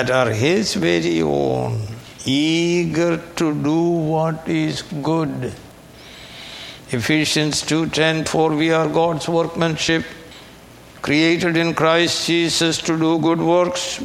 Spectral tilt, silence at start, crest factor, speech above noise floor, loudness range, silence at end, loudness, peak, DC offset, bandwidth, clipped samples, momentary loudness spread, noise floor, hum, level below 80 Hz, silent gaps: -4.5 dB/octave; 0 s; 18 dB; 24 dB; 4 LU; 0 s; -18 LUFS; 0 dBFS; under 0.1%; 15 kHz; under 0.1%; 12 LU; -42 dBFS; none; -50 dBFS; none